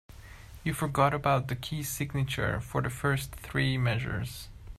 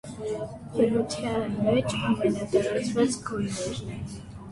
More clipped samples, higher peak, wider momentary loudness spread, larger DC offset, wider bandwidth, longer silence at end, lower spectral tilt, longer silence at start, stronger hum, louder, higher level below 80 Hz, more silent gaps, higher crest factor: neither; about the same, -10 dBFS vs -10 dBFS; about the same, 12 LU vs 10 LU; neither; first, 15 kHz vs 11.5 kHz; about the same, 0.05 s vs 0 s; about the same, -5.5 dB/octave vs -5.5 dB/octave; about the same, 0.1 s vs 0.05 s; neither; second, -30 LUFS vs -27 LUFS; about the same, -48 dBFS vs -52 dBFS; neither; about the same, 20 dB vs 16 dB